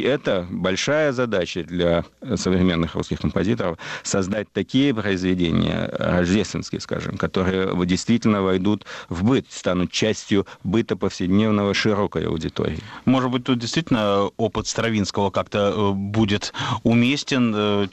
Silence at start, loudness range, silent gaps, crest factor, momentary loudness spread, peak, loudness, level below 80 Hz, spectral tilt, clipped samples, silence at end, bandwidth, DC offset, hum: 0 s; 1 LU; none; 14 dB; 6 LU; -8 dBFS; -22 LUFS; -46 dBFS; -5.5 dB/octave; under 0.1%; 0 s; 8.6 kHz; under 0.1%; none